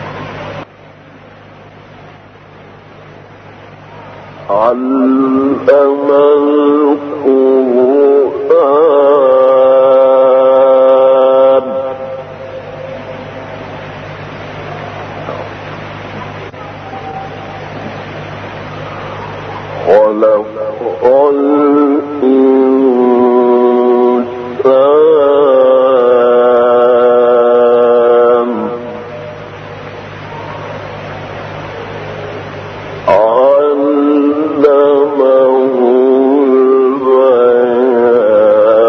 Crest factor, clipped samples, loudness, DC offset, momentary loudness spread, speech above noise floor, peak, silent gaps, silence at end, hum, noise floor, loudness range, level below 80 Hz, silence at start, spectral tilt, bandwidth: 10 dB; under 0.1%; -9 LUFS; under 0.1%; 18 LU; 28 dB; 0 dBFS; none; 0 s; none; -37 dBFS; 17 LU; -50 dBFS; 0 s; -8 dB/octave; 6.2 kHz